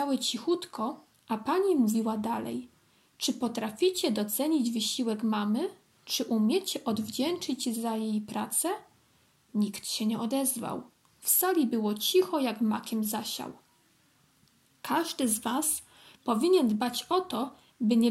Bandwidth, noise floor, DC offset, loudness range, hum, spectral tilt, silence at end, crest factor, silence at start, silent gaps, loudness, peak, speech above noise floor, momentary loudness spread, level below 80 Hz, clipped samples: 16.5 kHz; -66 dBFS; under 0.1%; 4 LU; none; -3.5 dB/octave; 0 s; 20 dB; 0 s; none; -29 LUFS; -10 dBFS; 37 dB; 10 LU; -76 dBFS; under 0.1%